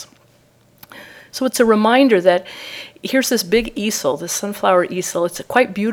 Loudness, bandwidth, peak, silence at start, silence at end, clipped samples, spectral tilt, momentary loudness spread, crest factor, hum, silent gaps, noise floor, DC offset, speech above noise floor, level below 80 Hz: -17 LUFS; over 20 kHz; 0 dBFS; 0 s; 0 s; under 0.1%; -3.5 dB/octave; 17 LU; 18 dB; none; none; -54 dBFS; under 0.1%; 37 dB; -50 dBFS